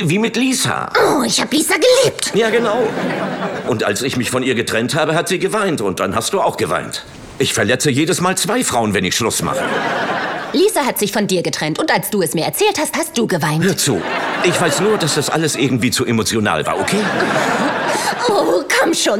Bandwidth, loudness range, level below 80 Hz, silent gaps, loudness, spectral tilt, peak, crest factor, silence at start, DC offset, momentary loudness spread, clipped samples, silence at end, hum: 18 kHz; 2 LU; -54 dBFS; none; -16 LUFS; -3.5 dB/octave; 0 dBFS; 16 dB; 0 s; under 0.1%; 4 LU; under 0.1%; 0 s; none